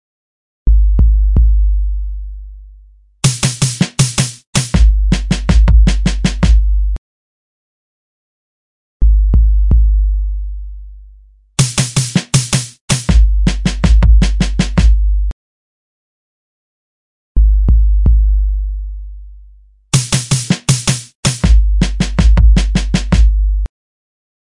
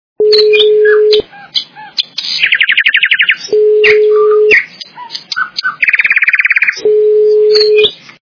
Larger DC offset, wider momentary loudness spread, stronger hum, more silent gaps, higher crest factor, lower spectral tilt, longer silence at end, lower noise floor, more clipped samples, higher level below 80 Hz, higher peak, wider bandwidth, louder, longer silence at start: neither; about the same, 11 LU vs 10 LU; neither; first, 4.47-4.53 s, 6.98-9.00 s, 12.81-12.88 s, 15.33-17.35 s, 21.15-21.23 s vs none; about the same, 12 dB vs 10 dB; first, -4.5 dB/octave vs -1.5 dB/octave; first, 0.75 s vs 0.3 s; first, -43 dBFS vs -29 dBFS; second, under 0.1% vs 0.6%; first, -14 dBFS vs -54 dBFS; about the same, 0 dBFS vs 0 dBFS; first, 11.5 kHz vs 5.4 kHz; second, -14 LUFS vs -8 LUFS; first, 0.65 s vs 0.2 s